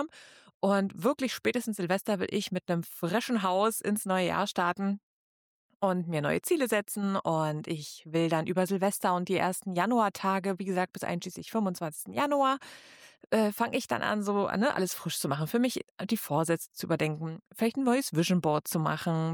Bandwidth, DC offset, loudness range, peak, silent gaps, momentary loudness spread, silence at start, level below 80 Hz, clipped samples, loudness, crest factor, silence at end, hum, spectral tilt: 19.5 kHz; under 0.1%; 2 LU; -14 dBFS; 0.54-0.60 s, 5.03-5.69 s, 5.75-5.80 s, 15.91-15.95 s; 6 LU; 0 s; -72 dBFS; under 0.1%; -30 LUFS; 16 dB; 0 s; none; -5 dB/octave